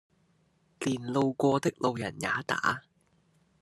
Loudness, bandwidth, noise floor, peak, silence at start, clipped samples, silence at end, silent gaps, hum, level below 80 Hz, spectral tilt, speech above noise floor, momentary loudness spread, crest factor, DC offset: -30 LUFS; 12.5 kHz; -69 dBFS; -10 dBFS; 0.8 s; under 0.1%; 0.8 s; none; none; -72 dBFS; -5.5 dB/octave; 40 dB; 7 LU; 22 dB; under 0.1%